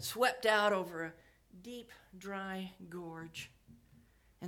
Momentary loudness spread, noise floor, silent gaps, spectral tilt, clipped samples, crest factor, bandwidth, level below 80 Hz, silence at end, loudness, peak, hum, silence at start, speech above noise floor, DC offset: 21 LU; -65 dBFS; none; -3.5 dB/octave; under 0.1%; 24 dB; 18.5 kHz; -72 dBFS; 0 s; -36 LUFS; -16 dBFS; none; 0 s; 28 dB; under 0.1%